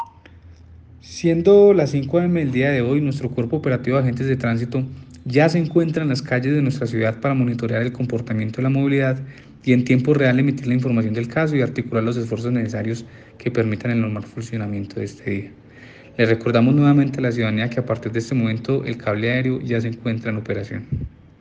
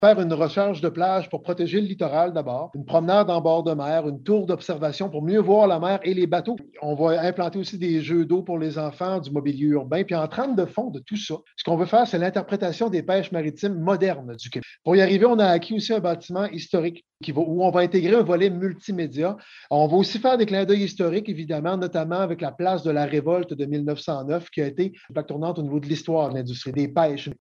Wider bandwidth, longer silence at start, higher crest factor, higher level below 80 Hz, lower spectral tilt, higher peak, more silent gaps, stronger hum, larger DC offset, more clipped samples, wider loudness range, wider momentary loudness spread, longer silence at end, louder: first, 8.4 kHz vs 7.4 kHz; about the same, 0 s vs 0 s; about the same, 18 dB vs 18 dB; first, -52 dBFS vs -68 dBFS; about the same, -8 dB/octave vs -7 dB/octave; about the same, -2 dBFS vs -4 dBFS; neither; neither; neither; neither; about the same, 6 LU vs 4 LU; about the same, 12 LU vs 10 LU; first, 0.3 s vs 0.05 s; first, -20 LUFS vs -23 LUFS